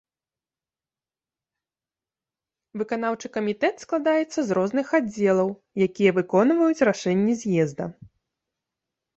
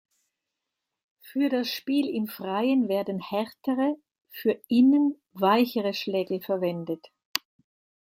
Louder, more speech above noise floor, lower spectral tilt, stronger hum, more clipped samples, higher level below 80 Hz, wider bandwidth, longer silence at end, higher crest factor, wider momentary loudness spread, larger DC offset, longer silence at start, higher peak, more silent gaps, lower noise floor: first, -23 LUFS vs -26 LUFS; first, over 67 dB vs 60 dB; about the same, -6.5 dB/octave vs -5.5 dB/octave; neither; neither; first, -66 dBFS vs -78 dBFS; second, 8.2 kHz vs 16.5 kHz; first, 1.1 s vs 0.7 s; second, 20 dB vs 26 dB; second, 8 LU vs 11 LU; neither; first, 2.75 s vs 1.25 s; second, -6 dBFS vs 0 dBFS; second, none vs 7.25-7.34 s; first, under -90 dBFS vs -85 dBFS